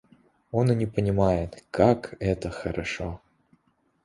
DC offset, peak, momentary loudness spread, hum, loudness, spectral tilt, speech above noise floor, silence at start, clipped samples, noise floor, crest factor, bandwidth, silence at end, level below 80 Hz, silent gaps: under 0.1%; -6 dBFS; 11 LU; none; -26 LUFS; -7.5 dB/octave; 43 dB; 0.55 s; under 0.1%; -68 dBFS; 22 dB; 11.5 kHz; 0.85 s; -44 dBFS; none